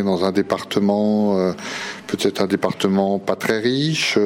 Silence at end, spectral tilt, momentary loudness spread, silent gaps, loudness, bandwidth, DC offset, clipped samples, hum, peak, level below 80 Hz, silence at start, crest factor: 0 s; -5 dB/octave; 6 LU; none; -20 LUFS; 16.5 kHz; under 0.1%; under 0.1%; none; -4 dBFS; -60 dBFS; 0 s; 16 dB